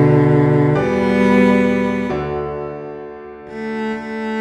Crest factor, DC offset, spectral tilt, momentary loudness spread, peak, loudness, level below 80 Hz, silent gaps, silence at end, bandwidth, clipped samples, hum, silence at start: 14 dB; under 0.1%; -8.5 dB/octave; 18 LU; -2 dBFS; -16 LUFS; -42 dBFS; none; 0 s; 9.2 kHz; under 0.1%; none; 0 s